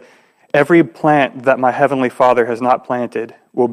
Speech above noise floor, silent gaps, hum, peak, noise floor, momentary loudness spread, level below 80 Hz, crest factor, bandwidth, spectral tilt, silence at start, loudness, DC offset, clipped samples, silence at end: 35 dB; none; none; 0 dBFS; -50 dBFS; 8 LU; -62 dBFS; 14 dB; 12 kHz; -7 dB/octave; 0.55 s; -15 LUFS; under 0.1%; under 0.1%; 0 s